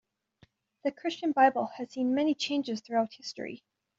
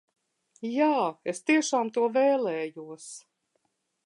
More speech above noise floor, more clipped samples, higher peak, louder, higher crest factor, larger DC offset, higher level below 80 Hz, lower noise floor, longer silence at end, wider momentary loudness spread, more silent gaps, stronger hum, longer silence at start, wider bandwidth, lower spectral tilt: second, 36 dB vs 49 dB; neither; about the same, -12 dBFS vs -12 dBFS; second, -30 LUFS vs -26 LUFS; about the same, 20 dB vs 16 dB; neither; first, -78 dBFS vs -84 dBFS; second, -65 dBFS vs -76 dBFS; second, 0.4 s vs 0.85 s; second, 15 LU vs 18 LU; neither; neither; first, 0.85 s vs 0.6 s; second, 7.8 kHz vs 11.5 kHz; second, -2 dB/octave vs -3.5 dB/octave